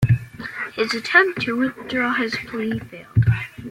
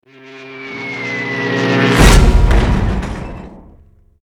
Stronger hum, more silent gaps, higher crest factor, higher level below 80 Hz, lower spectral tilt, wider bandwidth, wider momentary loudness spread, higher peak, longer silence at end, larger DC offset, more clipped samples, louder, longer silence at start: neither; neither; first, 20 dB vs 14 dB; second, -44 dBFS vs -16 dBFS; first, -6.5 dB/octave vs -5 dB/octave; second, 12 kHz vs 15.5 kHz; second, 12 LU vs 21 LU; about the same, 0 dBFS vs 0 dBFS; second, 0 s vs 0.7 s; neither; neither; second, -21 LUFS vs -14 LUFS; second, 0 s vs 0.25 s